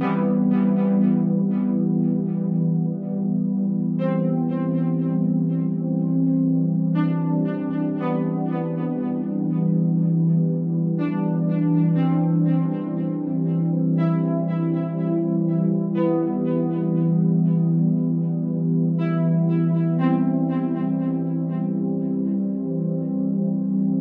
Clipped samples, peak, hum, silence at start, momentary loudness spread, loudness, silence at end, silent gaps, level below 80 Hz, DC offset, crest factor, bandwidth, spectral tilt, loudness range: under 0.1%; -8 dBFS; none; 0 s; 5 LU; -22 LUFS; 0 s; none; -74 dBFS; under 0.1%; 12 dB; 3.5 kHz; -13 dB/octave; 2 LU